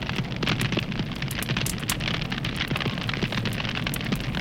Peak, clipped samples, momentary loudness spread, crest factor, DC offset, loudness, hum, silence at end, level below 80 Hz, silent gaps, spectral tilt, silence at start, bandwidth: -8 dBFS; under 0.1%; 3 LU; 20 dB; under 0.1%; -27 LUFS; none; 0 s; -40 dBFS; none; -4.5 dB/octave; 0 s; 17 kHz